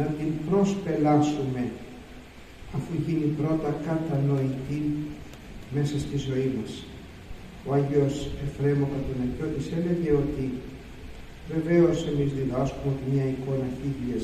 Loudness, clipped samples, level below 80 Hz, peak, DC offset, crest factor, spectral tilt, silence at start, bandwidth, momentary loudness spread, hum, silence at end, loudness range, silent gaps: -27 LUFS; under 0.1%; -46 dBFS; -10 dBFS; under 0.1%; 18 dB; -8 dB/octave; 0 s; 12 kHz; 20 LU; none; 0 s; 2 LU; none